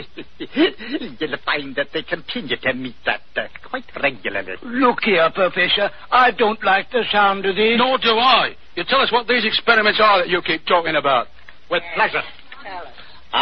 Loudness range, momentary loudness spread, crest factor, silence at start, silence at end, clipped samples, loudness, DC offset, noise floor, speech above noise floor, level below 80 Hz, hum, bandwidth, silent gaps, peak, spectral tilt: 8 LU; 14 LU; 18 dB; 0 s; 0 s; under 0.1%; -18 LUFS; 2%; -42 dBFS; 23 dB; -52 dBFS; none; 6.4 kHz; none; -2 dBFS; -6 dB/octave